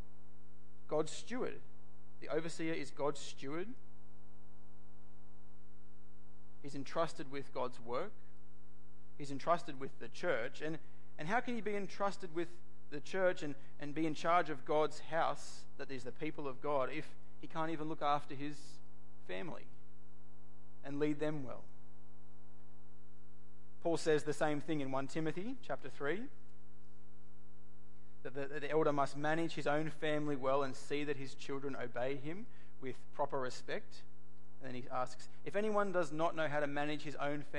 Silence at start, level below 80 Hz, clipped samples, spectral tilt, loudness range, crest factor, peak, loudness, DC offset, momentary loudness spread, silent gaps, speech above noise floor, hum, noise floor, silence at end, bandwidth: 0.9 s; -72 dBFS; under 0.1%; -5.5 dB/octave; 8 LU; 22 dB; -20 dBFS; -40 LUFS; 2%; 15 LU; none; 25 dB; none; -65 dBFS; 0 s; 11.5 kHz